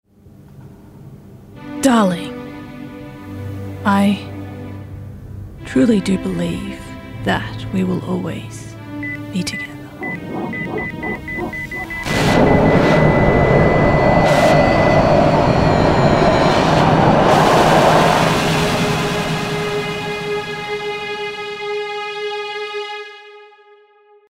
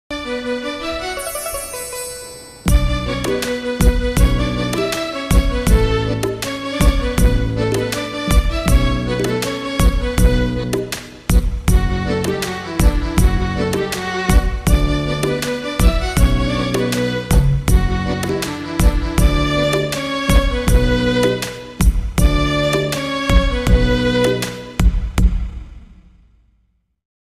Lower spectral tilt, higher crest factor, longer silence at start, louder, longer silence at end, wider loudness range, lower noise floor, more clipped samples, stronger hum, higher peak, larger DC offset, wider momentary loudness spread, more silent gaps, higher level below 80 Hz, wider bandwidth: about the same, -6 dB/octave vs -5.5 dB/octave; about the same, 16 dB vs 14 dB; first, 0.55 s vs 0.1 s; about the same, -16 LUFS vs -18 LUFS; second, 0.85 s vs 1.3 s; first, 11 LU vs 2 LU; second, -50 dBFS vs -62 dBFS; neither; neither; about the same, 0 dBFS vs -2 dBFS; neither; first, 19 LU vs 7 LU; neither; second, -34 dBFS vs -18 dBFS; about the same, 16 kHz vs 15.5 kHz